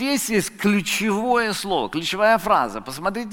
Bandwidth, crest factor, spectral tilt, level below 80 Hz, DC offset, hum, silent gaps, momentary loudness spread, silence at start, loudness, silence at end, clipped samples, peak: 17 kHz; 18 dB; -3.5 dB/octave; -50 dBFS; under 0.1%; none; none; 8 LU; 0 s; -21 LUFS; 0 s; under 0.1%; -4 dBFS